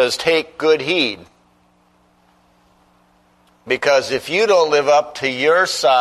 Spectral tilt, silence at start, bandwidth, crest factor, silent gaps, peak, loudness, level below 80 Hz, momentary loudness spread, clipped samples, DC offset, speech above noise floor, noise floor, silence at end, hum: -2.5 dB/octave; 0 s; 13.5 kHz; 16 dB; none; -2 dBFS; -16 LUFS; -60 dBFS; 7 LU; under 0.1%; under 0.1%; 40 dB; -56 dBFS; 0 s; 60 Hz at -60 dBFS